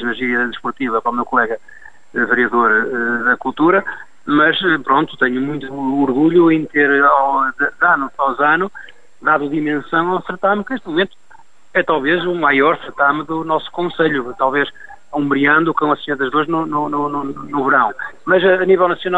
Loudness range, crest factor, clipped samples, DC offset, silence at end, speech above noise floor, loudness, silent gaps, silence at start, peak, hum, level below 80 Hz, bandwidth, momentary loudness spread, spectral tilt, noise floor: 3 LU; 16 dB; under 0.1%; 1%; 0 s; 33 dB; -16 LUFS; none; 0 s; 0 dBFS; none; -54 dBFS; 7.8 kHz; 9 LU; -7 dB/octave; -49 dBFS